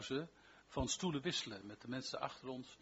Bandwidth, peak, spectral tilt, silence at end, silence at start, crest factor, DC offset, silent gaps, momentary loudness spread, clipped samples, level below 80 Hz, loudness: 8 kHz; -26 dBFS; -3.5 dB/octave; 0.05 s; 0 s; 18 dB; under 0.1%; none; 10 LU; under 0.1%; -62 dBFS; -43 LUFS